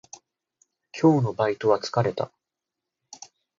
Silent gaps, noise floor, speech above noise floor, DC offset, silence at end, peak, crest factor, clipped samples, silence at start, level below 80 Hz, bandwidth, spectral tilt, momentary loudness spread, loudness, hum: none; -86 dBFS; 64 dB; under 0.1%; 1.3 s; -6 dBFS; 20 dB; under 0.1%; 0.95 s; -66 dBFS; 7.6 kHz; -6.5 dB/octave; 24 LU; -24 LUFS; none